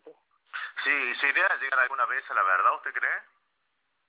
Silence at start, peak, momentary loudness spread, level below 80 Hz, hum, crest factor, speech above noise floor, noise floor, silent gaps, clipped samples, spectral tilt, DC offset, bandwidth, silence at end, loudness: 0.05 s; -10 dBFS; 11 LU; under -90 dBFS; none; 18 dB; 50 dB; -77 dBFS; none; under 0.1%; 5.5 dB/octave; under 0.1%; 4 kHz; 0.85 s; -25 LUFS